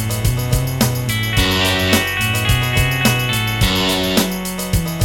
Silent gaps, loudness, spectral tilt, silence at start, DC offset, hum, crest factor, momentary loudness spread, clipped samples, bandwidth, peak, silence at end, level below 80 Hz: none; -16 LUFS; -4 dB/octave; 0 s; under 0.1%; none; 16 dB; 5 LU; under 0.1%; 17.5 kHz; 0 dBFS; 0 s; -28 dBFS